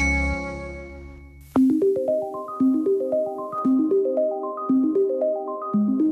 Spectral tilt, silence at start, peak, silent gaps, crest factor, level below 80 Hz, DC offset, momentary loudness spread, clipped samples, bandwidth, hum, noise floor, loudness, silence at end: -7.5 dB/octave; 0 s; -10 dBFS; none; 12 dB; -38 dBFS; under 0.1%; 13 LU; under 0.1%; 8.6 kHz; none; -43 dBFS; -23 LUFS; 0 s